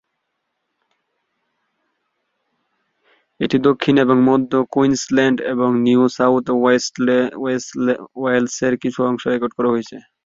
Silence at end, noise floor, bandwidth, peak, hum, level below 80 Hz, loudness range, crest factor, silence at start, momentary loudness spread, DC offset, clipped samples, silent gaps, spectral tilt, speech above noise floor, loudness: 0.25 s; -74 dBFS; 7.8 kHz; 0 dBFS; none; -60 dBFS; 5 LU; 18 dB; 3.4 s; 6 LU; under 0.1%; under 0.1%; none; -5.5 dB/octave; 58 dB; -17 LUFS